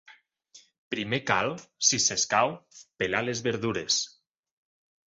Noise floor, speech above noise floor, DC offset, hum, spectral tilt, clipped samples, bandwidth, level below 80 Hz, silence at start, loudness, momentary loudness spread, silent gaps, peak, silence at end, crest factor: -58 dBFS; 30 dB; under 0.1%; none; -2 dB/octave; under 0.1%; 8.2 kHz; -64 dBFS; 0.1 s; -26 LUFS; 11 LU; 0.78-0.91 s; -8 dBFS; 1 s; 22 dB